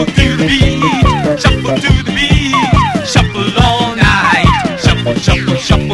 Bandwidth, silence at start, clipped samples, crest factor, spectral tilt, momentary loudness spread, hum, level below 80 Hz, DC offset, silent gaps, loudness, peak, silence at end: 12 kHz; 0 s; 0.6%; 10 dB; -5 dB/octave; 3 LU; none; -20 dBFS; under 0.1%; none; -11 LUFS; 0 dBFS; 0 s